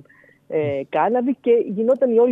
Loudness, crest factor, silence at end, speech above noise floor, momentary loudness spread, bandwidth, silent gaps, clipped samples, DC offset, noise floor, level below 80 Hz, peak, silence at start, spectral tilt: -20 LUFS; 14 dB; 0 s; 33 dB; 7 LU; 3.8 kHz; none; under 0.1%; under 0.1%; -51 dBFS; -72 dBFS; -6 dBFS; 0.5 s; -9 dB/octave